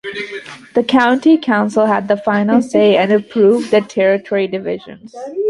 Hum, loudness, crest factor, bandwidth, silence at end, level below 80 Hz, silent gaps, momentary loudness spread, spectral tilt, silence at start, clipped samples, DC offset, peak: none; -14 LUFS; 14 dB; 11.5 kHz; 0 s; -60 dBFS; none; 15 LU; -6 dB/octave; 0.05 s; under 0.1%; under 0.1%; 0 dBFS